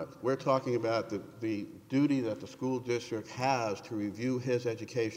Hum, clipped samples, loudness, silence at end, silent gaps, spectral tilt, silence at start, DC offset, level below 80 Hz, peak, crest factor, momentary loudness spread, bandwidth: none; under 0.1%; -33 LUFS; 0 s; none; -6.5 dB/octave; 0 s; under 0.1%; -74 dBFS; -14 dBFS; 18 dB; 8 LU; 16 kHz